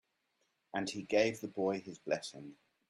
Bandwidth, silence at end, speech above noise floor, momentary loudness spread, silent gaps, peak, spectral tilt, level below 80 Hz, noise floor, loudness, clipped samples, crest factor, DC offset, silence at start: 14 kHz; 0.35 s; 44 dB; 15 LU; none; -16 dBFS; -4.5 dB/octave; -76 dBFS; -80 dBFS; -36 LUFS; under 0.1%; 22 dB; under 0.1%; 0.75 s